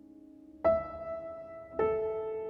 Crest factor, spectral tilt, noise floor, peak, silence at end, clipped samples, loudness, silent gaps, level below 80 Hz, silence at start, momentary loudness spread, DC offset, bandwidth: 18 dB; -9 dB/octave; -54 dBFS; -16 dBFS; 0 s; under 0.1%; -33 LUFS; none; -58 dBFS; 0.1 s; 17 LU; under 0.1%; 5 kHz